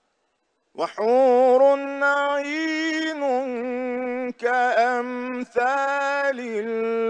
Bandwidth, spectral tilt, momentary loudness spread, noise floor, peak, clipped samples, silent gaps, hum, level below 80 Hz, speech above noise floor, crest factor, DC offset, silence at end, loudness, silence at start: 9 kHz; -3.5 dB/octave; 11 LU; -72 dBFS; -8 dBFS; under 0.1%; none; none; -76 dBFS; 51 dB; 14 dB; under 0.1%; 0 s; -22 LUFS; 0.75 s